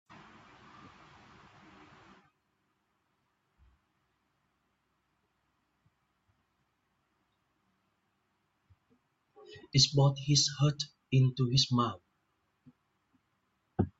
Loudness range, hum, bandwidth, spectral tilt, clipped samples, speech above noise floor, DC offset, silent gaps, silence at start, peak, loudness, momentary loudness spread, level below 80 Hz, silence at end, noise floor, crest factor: 4 LU; none; 8 kHz; -4.5 dB/octave; under 0.1%; 50 dB; under 0.1%; none; 9.5 s; -12 dBFS; -29 LUFS; 11 LU; -66 dBFS; 0.1 s; -78 dBFS; 24 dB